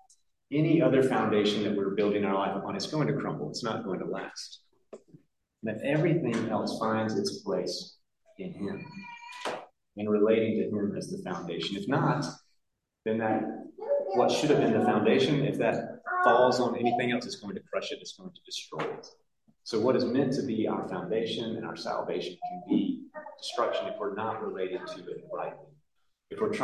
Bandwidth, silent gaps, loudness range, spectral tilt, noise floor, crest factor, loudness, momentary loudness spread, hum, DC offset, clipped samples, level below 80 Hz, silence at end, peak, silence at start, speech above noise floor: 12.5 kHz; none; 8 LU; -6 dB/octave; -78 dBFS; 20 dB; -29 LUFS; 15 LU; none; under 0.1%; under 0.1%; -72 dBFS; 0 s; -10 dBFS; 0.5 s; 49 dB